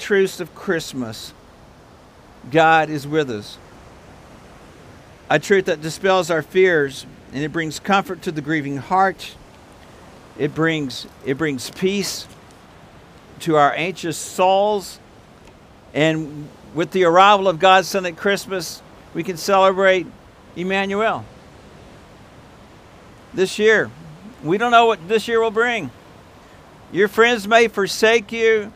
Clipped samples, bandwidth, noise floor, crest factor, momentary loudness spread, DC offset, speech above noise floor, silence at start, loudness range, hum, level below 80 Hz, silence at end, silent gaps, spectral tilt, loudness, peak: under 0.1%; 16 kHz; -46 dBFS; 20 dB; 17 LU; under 0.1%; 28 dB; 0 s; 6 LU; none; -54 dBFS; 0.05 s; none; -4.5 dB/octave; -18 LUFS; 0 dBFS